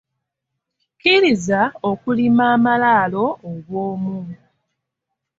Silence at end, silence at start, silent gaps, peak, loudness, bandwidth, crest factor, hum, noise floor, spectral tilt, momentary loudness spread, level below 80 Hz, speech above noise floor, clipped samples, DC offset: 1.05 s; 1.05 s; none; -2 dBFS; -17 LUFS; 7.8 kHz; 18 dB; none; -80 dBFS; -5.5 dB/octave; 13 LU; -58 dBFS; 63 dB; under 0.1%; under 0.1%